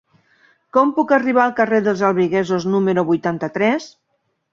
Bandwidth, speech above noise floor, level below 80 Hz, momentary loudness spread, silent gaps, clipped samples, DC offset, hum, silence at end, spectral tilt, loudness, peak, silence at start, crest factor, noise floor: 7.6 kHz; 53 dB; -62 dBFS; 4 LU; none; under 0.1%; under 0.1%; none; 0.65 s; -7 dB/octave; -17 LUFS; -2 dBFS; 0.75 s; 16 dB; -70 dBFS